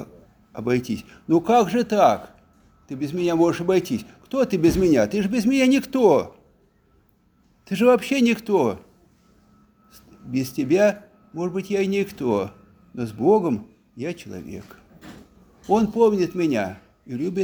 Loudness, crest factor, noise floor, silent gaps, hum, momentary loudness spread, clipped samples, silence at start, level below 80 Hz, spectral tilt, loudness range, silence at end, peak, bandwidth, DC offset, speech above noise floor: -21 LUFS; 18 dB; -61 dBFS; none; none; 17 LU; under 0.1%; 0 s; -52 dBFS; -6 dB/octave; 5 LU; 0 s; -4 dBFS; over 20 kHz; under 0.1%; 40 dB